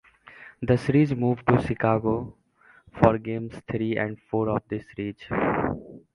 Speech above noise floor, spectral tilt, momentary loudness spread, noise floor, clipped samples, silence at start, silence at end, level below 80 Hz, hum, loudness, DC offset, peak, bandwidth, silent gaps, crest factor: 32 dB; -9 dB/octave; 13 LU; -56 dBFS; under 0.1%; 0.25 s; 0.15 s; -48 dBFS; none; -25 LUFS; under 0.1%; -2 dBFS; 11 kHz; none; 24 dB